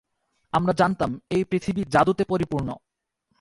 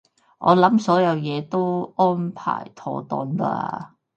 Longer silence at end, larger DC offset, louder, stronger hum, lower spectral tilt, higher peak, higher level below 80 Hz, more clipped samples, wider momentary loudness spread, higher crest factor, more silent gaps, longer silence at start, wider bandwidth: first, 0.65 s vs 0.3 s; neither; about the same, -24 LUFS vs -22 LUFS; neither; about the same, -7 dB/octave vs -7.5 dB/octave; second, -6 dBFS vs -2 dBFS; first, -50 dBFS vs -68 dBFS; neither; second, 8 LU vs 13 LU; about the same, 20 dB vs 20 dB; neither; first, 0.55 s vs 0.4 s; first, 11.5 kHz vs 8.4 kHz